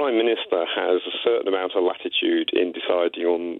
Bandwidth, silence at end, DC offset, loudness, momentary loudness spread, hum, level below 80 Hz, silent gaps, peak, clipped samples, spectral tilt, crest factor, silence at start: 4.2 kHz; 0 s; under 0.1%; -22 LUFS; 2 LU; none; -74 dBFS; none; -8 dBFS; under 0.1%; -6.5 dB/octave; 14 dB; 0 s